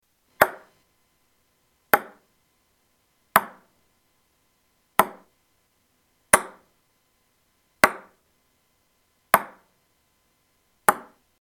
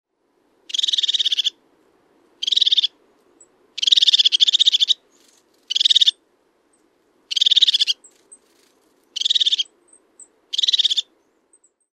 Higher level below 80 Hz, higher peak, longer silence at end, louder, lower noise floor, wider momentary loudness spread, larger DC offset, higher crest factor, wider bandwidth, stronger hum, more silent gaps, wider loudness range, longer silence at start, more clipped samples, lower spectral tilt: first, -62 dBFS vs -86 dBFS; about the same, 0 dBFS vs 0 dBFS; second, 0.4 s vs 0.9 s; second, -23 LUFS vs -16 LUFS; about the same, -68 dBFS vs -65 dBFS; first, 22 LU vs 12 LU; neither; first, 28 dB vs 20 dB; first, 17 kHz vs 14 kHz; neither; neither; second, 2 LU vs 5 LU; second, 0.4 s vs 0.75 s; neither; first, -2 dB/octave vs 5.5 dB/octave